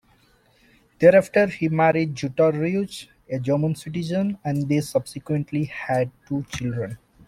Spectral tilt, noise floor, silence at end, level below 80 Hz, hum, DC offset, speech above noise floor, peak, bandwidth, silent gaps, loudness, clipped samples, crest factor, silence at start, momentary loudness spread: -7 dB/octave; -59 dBFS; 0.3 s; -56 dBFS; none; under 0.1%; 37 dB; -2 dBFS; 15 kHz; none; -23 LUFS; under 0.1%; 20 dB; 1 s; 11 LU